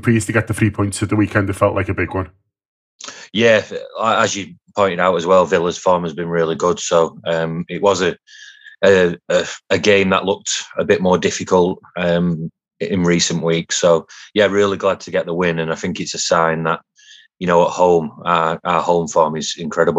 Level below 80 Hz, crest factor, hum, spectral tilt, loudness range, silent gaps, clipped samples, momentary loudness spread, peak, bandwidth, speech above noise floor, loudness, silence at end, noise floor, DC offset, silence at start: -52 dBFS; 16 dB; none; -4.5 dB/octave; 2 LU; 2.65-2.99 s; under 0.1%; 9 LU; 0 dBFS; 13.5 kHz; 30 dB; -17 LUFS; 0 s; -47 dBFS; under 0.1%; 0.05 s